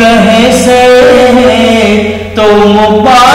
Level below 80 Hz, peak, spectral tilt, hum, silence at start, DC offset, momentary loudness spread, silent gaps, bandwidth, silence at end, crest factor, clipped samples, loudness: -30 dBFS; 0 dBFS; -4.5 dB/octave; none; 0 s; under 0.1%; 5 LU; none; 16 kHz; 0 s; 4 dB; 10%; -4 LUFS